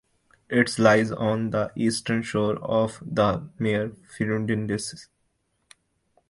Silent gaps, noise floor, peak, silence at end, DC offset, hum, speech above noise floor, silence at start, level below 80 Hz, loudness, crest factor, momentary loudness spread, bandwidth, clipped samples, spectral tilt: none; -72 dBFS; -4 dBFS; 1.25 s; under 0.1%; none; 48 dB; 0.5 s; -56 dBFS; -25 LUFS; 22 dB; 10 LU; 11.5 kHz; under 0.1%; -5.5 dB/octave